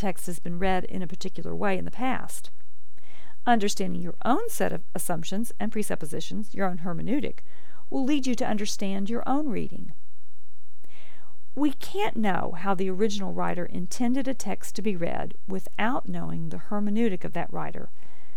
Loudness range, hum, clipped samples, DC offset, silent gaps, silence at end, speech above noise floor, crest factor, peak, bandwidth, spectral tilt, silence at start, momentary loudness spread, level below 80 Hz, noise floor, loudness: 3 LU; none; under 0.1%; 10%; none; 0.5 s; 35 dB; 20 dB; -8 dBFS; 19 kHz; -5 dB/octave; 0 s; 9 LU; -52 dBFS; -65 dBFS; -30 LUFS